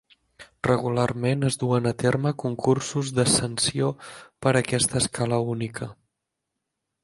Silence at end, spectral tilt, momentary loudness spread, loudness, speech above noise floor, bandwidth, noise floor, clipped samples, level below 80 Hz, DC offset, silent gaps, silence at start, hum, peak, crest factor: 1.1 s; -4.5 dB/octave; 9 LU; -24 LUFS; 58 dB; 11.5 kHz; -82 dBFS; under 0.1%; -54 dBFS; under 0.1%; none; 0.4 s; none; -6 dBFS; 20 dB